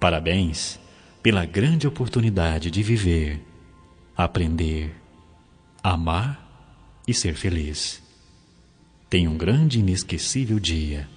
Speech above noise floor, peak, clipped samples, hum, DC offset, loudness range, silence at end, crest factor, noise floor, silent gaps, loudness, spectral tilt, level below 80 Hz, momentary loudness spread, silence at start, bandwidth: 32 dB; -2 dBFS; under 0.1%; none; under 0.1%; 4 LU; 0 s; 22 dB; -54 dBFS; none; -23 LUFS; -5 dB/octave; -38 dBFS; 10 LU; 0 s; 10 kHz